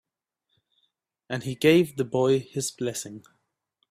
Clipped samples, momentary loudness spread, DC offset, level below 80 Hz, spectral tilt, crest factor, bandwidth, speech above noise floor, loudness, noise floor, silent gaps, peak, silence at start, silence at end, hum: under 0.1%; 15 LU; under 0.1%; -66 dBFS; -5 dB/octave; 22 dB; 15.5 kHz; 58 dB; -25 LUFS; -82 dBFS; none; -6 dBFS; 1.3 s; 0.7 s; none